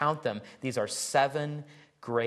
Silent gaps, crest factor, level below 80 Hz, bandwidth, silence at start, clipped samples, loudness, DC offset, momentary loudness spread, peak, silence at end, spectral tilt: none; 20 dB; -76 dBFS; 12.5 kHz; 0 s; under 0.1%; -31 LUFS; under 0.1%; 12 LU; -10 dBFS; 0 s; -4 dB/octave